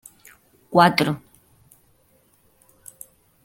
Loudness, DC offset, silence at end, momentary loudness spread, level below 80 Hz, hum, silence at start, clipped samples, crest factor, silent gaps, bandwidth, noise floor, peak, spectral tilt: -19 LUFS; under 0.1%; 2.25 s; 28 LU; -62 dBFS; none; 0.7 s; under 0.1%; 24 dB; none; 17 kHz; -61 dBFS; -2 dBFS; -5.5 dB/octave